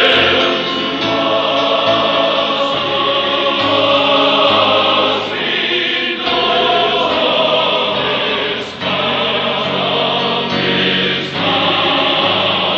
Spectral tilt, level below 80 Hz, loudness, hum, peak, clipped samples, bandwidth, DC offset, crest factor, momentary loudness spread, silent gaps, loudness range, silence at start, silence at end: -4.5 dB/octave; -50 dBFS; -13 LUFS; none; 0 dBFS; under 0.1%; 8 kHz; under 0.1%; 14 dB; 5 LU; none; 2 LU; 0 s; 0 s